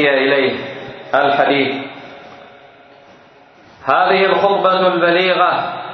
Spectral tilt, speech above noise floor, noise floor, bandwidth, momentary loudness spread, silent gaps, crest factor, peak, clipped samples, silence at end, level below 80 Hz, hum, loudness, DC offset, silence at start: -6.5 dB/octave; 31 dB; -45 dBFS; 6.2 kHz; 15 LU; none; 16 dB; 0 dBFS; under 0.1%; 0 s; -62 dBFS; none; -14 LUFS; under 0.1%; 0 s